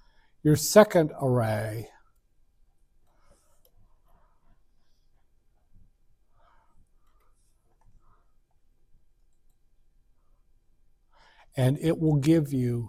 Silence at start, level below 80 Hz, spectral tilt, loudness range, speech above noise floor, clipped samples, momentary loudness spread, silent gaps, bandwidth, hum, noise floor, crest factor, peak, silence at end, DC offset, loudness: 0.45 s; -56 dBFS; -6 dB/octave; 15 LU; 41 dB; under 0.1%; 17 LU; none; 16 kHz; none; -64 dBFS; 26 dB; -4 dBFS; 0 s; under 0.1%; -24 LUFS